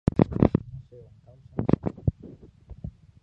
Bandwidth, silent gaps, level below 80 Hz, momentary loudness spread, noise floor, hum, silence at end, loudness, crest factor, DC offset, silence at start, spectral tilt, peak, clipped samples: 5.8 kHz; none; -40 dBFS; 22 LU; -52 dBFS; none; 0.35 s; -26 LUFS; 26 dB; under 0.1%; 0.15 s; -11 dB/octave; -2 dBFS; under 0.1%